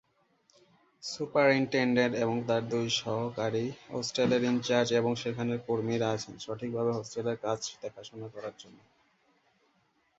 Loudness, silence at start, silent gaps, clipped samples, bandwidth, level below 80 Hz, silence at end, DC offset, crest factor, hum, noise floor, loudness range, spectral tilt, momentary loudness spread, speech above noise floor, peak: -30 LUFS; 1 s; none; under 0.1%; 8 kHz; -70 dBFS; 1.5 s; under 0.1%; 20 dB; none; -71 dBFS; 8 LU; -5 dB/octave; 15 LU; 41 dB; -12 dBFS